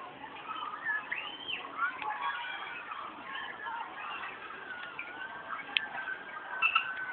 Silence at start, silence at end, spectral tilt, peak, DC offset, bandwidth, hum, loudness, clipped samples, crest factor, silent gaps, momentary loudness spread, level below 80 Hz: 0 s; 0 s; 2.5 dB/octave; -6 dBFS; under 0.1%; 4.6 kHz; none; -36 LUFS; under 0.1%; 32 dB; none; 11 LU; -78 dBFS